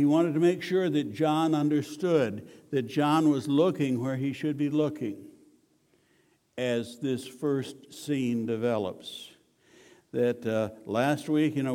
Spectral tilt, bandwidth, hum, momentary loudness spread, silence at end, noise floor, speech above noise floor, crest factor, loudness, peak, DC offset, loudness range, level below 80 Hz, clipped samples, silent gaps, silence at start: -6.5 dB/octave; 15.5 kHz; none; 12 LU; 0 s; -67 dBFS; 40 dB; 16 dB; -28 LUFS; -12 dBFS; under 0.1%; 6 LU; -74 dBFS; under 0.1%; none; 0 s